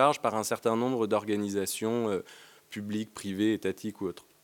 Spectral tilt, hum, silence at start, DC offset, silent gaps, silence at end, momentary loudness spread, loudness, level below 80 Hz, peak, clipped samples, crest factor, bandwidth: -5 dB/octave; none; 0 s; under 0.1%; none; 0.25 s; 10 LU; -31 LUFS; -78 dBFS; -8 dBFS; under 0.1%; 22 dB; 17.5 kHz